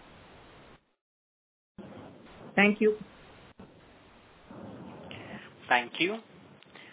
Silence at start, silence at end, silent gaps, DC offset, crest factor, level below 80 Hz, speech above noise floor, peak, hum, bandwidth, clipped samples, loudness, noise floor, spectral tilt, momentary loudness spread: 1.8 s; 0.75 s; none; under 0.1%; 24 dB; -68 dBFS; 30 dB; -10 dBFS; none; 4 kHz; under 0.1%; -27 LUFS; -57 dBFS; -3 dB/octave; 27 LU